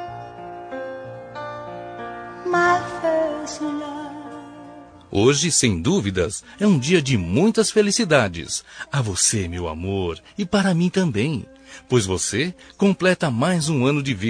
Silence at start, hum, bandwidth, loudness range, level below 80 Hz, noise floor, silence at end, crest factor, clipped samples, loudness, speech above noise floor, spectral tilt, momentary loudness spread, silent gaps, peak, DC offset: 0 s; none; 10.5 kHz; 5 LU; -48 dBFS; -42 dBFS; 0 s; 20 dB; under 0.1%; -20 LUFS; 22 dB; -4.5 dB/octave; 17 LU; none; -2 dBFS; under 0.1%